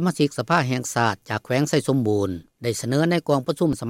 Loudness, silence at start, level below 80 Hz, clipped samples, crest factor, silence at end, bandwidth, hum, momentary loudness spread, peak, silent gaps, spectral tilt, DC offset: -23 LUFS; 0 s; -58 dBFS; under 0.1%; 16 dB; 0 s; 16.5 kHz; none; 7 LU; -6 dBFS; none; -5.5 dB/octave; under 0.1%